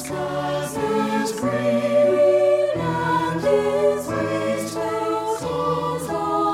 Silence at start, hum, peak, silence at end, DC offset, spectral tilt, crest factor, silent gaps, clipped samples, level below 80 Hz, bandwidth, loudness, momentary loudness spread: 0 s; none; -8 dBFS; 0 s; under 0.1%; -5.5 dB/octave; 14 dB; none; under 0.1%; -52 dBFS; 15.5 kHz; -21 LUFS; 8 LU